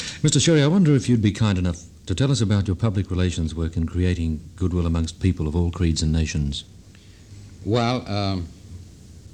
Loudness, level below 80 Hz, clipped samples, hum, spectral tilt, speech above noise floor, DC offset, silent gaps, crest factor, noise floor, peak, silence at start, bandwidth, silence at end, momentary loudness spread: -22 LUFS; -36 dBFS; under 0.1%; none; -5.5 dB/octave; 26 dB; under 0.1%; none; 16 dB; -46 dBFS; -6 dBFS; 0 s; 10 kHz; 0.05 s; 13 LU